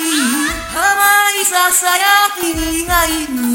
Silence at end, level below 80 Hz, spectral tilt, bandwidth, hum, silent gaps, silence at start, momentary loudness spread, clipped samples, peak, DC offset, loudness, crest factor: 0 s; -34 dBFS; -1 dB/octave; 17 kHz; none; none; 0 s; 7 LU; under 0.1%; 0 dBFS; under 0.1%; -12 LUFS; 14 dB